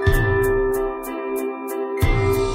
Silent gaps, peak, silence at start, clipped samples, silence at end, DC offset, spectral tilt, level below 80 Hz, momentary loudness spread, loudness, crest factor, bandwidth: none; -4 dBFS; 0 s; under 0.1%; 0 s; under 0.1%; -6.5 dB/octave; -26 dBFS; 8 LU; -22 LUFS; 16 dB; 16 kHz